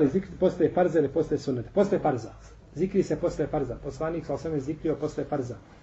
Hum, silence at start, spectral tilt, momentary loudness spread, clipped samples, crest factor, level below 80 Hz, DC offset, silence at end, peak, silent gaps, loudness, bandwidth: none; 0 s; -8 dB/octave; 9 LU; under 0.1%; 16 dB; -50 dBFS; under 0.1%; 0.05 s; -10 dBFS; none; -28 LUFS; 8.2 kHz